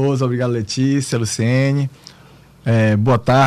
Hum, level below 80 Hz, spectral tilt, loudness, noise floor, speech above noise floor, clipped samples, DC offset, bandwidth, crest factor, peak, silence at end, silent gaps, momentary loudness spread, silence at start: none; -48 dBFS; -6 dB/octave; -18 LUFS; -45 dBFS; 29 dB; under 0.1%; under 0.1%; 13.5 kHz; 10 dB; -6 dBFS; 0 s; none; 6 LU; 0 s